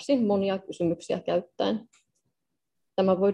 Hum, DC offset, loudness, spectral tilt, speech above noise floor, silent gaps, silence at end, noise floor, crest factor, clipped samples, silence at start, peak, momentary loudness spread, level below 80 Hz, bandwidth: none; under 0.1%; -28 LUFS; -7 dB/octave; 58 dB; none; 0 s; -84 dBFS; 18 dB; under 0.1%; 0 s; -10 dBFS; 7 LU; -68 dBFS; 10 kHz